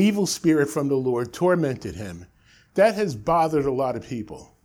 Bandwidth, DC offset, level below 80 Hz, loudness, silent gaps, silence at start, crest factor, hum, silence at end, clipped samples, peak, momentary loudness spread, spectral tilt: 18 kHz; under 0.1%; -52 dBFS; -23 LUFS; none; 0 s; 18 dB; none; 0.2 s; under 0.1%; -6 dBFS; 13 LU; -5.5 dB/octave